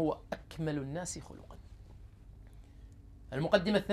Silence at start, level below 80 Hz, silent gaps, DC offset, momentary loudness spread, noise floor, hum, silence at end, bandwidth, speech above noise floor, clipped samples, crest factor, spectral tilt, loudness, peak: 0 s; -54 dBFS; none; under 0.1%; 26 LU; -53 dBFS; none; 0 s; 14.5 kHz; 20 dB; under 0.1%; 24 dB; -5.5 dB/octave; -35 LUFS; -12 dBFS